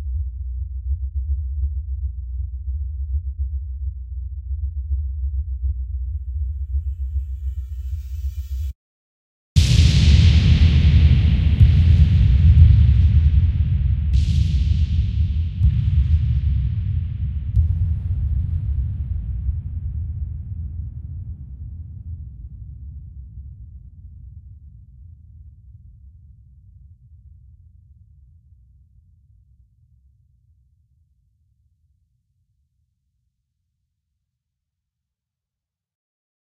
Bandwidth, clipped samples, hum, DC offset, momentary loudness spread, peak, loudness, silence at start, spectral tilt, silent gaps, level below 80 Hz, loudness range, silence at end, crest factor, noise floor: 8.4 kHz; under 0.1%; none; under 0.1%; 21 LU; 0 dBFS; -20 LUFS; 0 s; -6.5 dB/octave; 8.75-9.56 s; -24 dBFS; 20 LU; 10.5 s; 20 dB; -87 dBFS